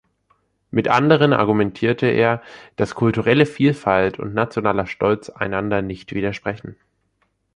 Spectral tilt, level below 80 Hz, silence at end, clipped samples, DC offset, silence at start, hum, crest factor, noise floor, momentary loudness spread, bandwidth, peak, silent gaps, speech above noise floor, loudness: -7.5 dB/octave; -50 dBFS; 0.85 s; under 0.1%; under 0.1%; 0.75 s; none; 18 dB; -68 dBFS; 11 LU; 10.5 kHz; -2 dBFS; none; 49 dB; -19 LUFS